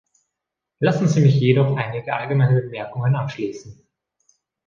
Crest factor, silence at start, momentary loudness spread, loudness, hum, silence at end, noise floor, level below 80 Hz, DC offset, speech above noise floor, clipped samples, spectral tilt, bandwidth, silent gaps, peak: 18 dB; 0.8 s; 13 LU; -20 LUFS; none; 0.95 s; -83 dBFS; -58 dBFS; under 0.1%; 64 dB; under 0.1%; -7.5 dB/octave; 7.2 kHz; none; -4 dBFS